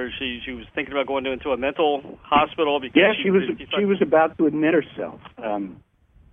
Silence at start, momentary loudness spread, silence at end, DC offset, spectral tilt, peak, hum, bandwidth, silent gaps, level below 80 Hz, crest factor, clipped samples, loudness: 0 s; 13 LU; 0.55 s; under 0.1%; -8.5 dB/octave; -4 dBFS; none; 3.8 kHz; none; -52 dBFS; 18 dB; under 0.1%; -22 LUFS